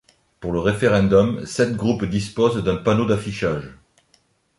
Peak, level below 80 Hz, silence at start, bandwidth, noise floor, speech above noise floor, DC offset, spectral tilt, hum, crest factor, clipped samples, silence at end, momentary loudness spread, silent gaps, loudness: -4 dBFS; -44 dBFS; 0.4 s; 11.5 kHz; -62 dBFS; 42 dB; under 0.1%; -6.5 dB/octave; none; 18 dB; under 0.1%; 0.85 s; 9 LU; none; -20 LUFS